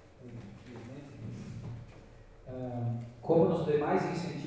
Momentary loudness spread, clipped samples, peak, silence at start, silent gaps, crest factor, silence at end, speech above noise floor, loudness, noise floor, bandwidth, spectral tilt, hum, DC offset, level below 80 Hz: 21 LU; under 0.1%; -14 dBFS; 0 s; none; 20 dB; 0 s; 24 dB; -32 LUFS; -53 dBFS; 8 kHz; -8 dB/octave; none; under 0.1%; -58 dBFS